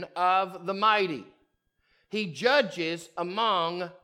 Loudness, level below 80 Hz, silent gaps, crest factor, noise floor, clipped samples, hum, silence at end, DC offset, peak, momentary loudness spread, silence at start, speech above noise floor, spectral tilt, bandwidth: -27 LUFS; -78 dBFS; none; 20 dB; -72 dBFS; under 0.1%; none; 0.1 s; under 0.1%; -8 dBFS; 9 LU; 0 s; 45 dB; -4.5 dB/octave; 15.5 kHz